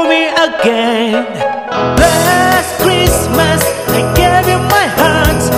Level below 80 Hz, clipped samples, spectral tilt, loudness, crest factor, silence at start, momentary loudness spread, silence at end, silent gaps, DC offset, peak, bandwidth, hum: -26 dBFS; 0.4%; -4 dB/octave; -11 LUFS; 10 dB; 0 s; 5 LU; 0 s; none; 0.2%; 0 dBFS; 18.5 kHz; none